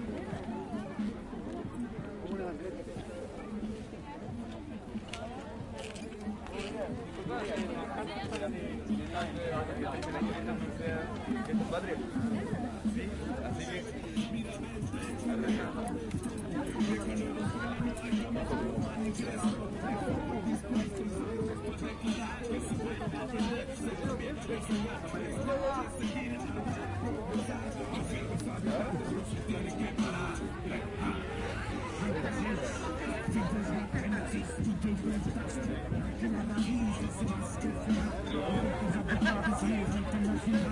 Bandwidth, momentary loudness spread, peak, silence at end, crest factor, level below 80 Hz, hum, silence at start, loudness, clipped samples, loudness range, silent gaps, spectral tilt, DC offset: 11.5 kHz; 8 LU; -16 dBFS; 0 s; 20 dB; -48 dBFS; none; 0 s; -36 LUFS; under 0.1%; 6 LU; none; -6 dB/octave; under 0.1%